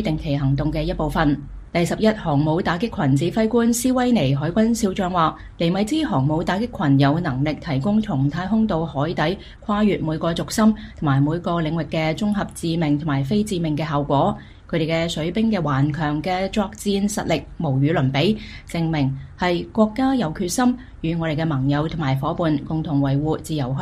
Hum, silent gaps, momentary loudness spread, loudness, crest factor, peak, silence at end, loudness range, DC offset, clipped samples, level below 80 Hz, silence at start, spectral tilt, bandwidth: none; none; 5 LU; -21 LUFS; 16 dB; -4 dBFS; 0 s; 2 LU; under 0.1%; under 0.1%; -40 dBFS; 0 s; -6.5 dB/octave; 15 kHz